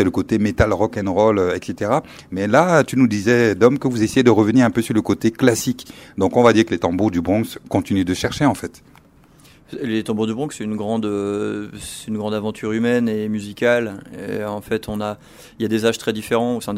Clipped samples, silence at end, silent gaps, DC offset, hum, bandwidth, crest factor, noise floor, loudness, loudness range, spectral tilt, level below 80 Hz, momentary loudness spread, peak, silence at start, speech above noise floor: under 0.1%; 0 s; none; under 0.1%; none; 16 kHz; 18 dB; -49 dBFS; -19 LUFS; 7 LU; -6 dB/octave; -44 dBFS; 13 LU; 0 dBFS; 0 s; 31 dB